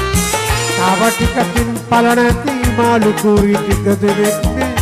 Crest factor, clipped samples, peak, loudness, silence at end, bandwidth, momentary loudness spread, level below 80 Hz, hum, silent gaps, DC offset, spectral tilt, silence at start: 12 dB; under 0.1%; -2 dBFS; -13 LUFS; 0 s; 15.5 kHz; 4 LU; -26 dBFS; none; none; under 0.1%; -5 dB/octave; 0 s